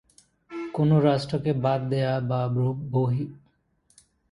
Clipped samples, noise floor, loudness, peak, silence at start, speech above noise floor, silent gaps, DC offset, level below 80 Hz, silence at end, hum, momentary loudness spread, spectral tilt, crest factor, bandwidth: under 0.1%; -67 dBFS; -25 LUFS; -8 dBFS; 0.5 s; 43 dB; none; under 0.1%; -58 dBFS; 0.95 s; none; 12 LU; -8.5 dB/octave; 18 dB; 11 kHz